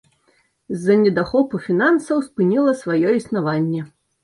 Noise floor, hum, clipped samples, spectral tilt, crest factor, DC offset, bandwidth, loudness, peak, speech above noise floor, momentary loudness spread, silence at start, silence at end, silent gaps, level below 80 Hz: -62 dBFS; none; under 0.1%; -7.5 dB/octave; 16 dB; under 0.1%; 11.5 kHz; -19 LUFS; -4 dBFS; 44 dB; 8 LU; 0.7 s; 0.35 s; none; -56 dBFS